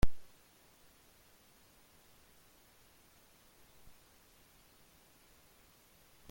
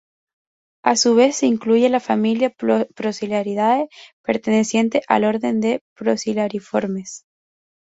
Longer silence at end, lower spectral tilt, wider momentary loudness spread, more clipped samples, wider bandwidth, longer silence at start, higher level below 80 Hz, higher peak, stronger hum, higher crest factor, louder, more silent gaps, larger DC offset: first, 6.1 s vs 0.75 s; about the same, -5.5 dB/octave vs -4.5 dB/octave; second, 1 LU vs 9 LU; neither; first, 17 kHz vs 8 kHz; second, 0.05 s vs 0.85 s; first, -50 dBFS vs -64 dBFS; second, -14 dBFS vs -2 dBFS; neither; first, 24 dB vs 18 dB; second, -58 LUFS vs -19 LUFS; second, none vs 4.13-4.24 s, 5.81-5.96 s; neither